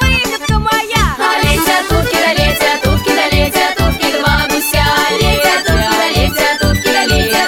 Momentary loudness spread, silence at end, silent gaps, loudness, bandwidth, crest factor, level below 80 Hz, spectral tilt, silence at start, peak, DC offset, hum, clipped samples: 2 LU; 0 s; none; -12 LUFS; 19.5 kHz; 12 dB; -20 dBFS; -4 dB/octave; 0 s; 0 dBFS; under 0.1%; none; under 0.1%